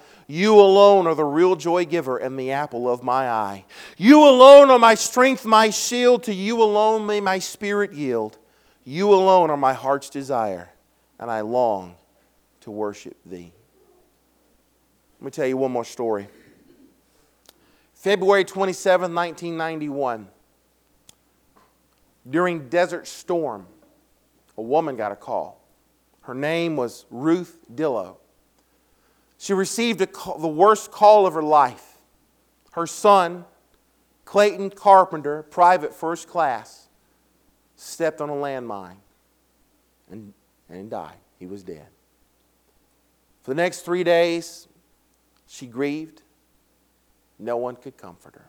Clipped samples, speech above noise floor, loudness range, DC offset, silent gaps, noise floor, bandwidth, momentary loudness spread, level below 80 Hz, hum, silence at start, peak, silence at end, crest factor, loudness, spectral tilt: under 0.1%; 45 dB; 19 LU; under 0.1%; none; -64 dBFS; 17 kHz; 22 LU; -70 dBFS; none; 0.3 s; 0 dBFS; 0.4 s; 20 dB; -19 LUFS; -4.5 dB/octave